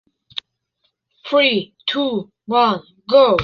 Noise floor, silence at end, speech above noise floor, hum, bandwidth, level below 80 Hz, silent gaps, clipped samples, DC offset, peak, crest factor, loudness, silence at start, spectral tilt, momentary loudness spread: -70 dBFS; 0 s; 53 dB; none; 6.6 kHz; -52 dBFS; none; under 0.1%; under 0.1%; -2 dBFS; 16 dB; -18 LUFS; 0.35 s; -6 dB/octave; 17 LU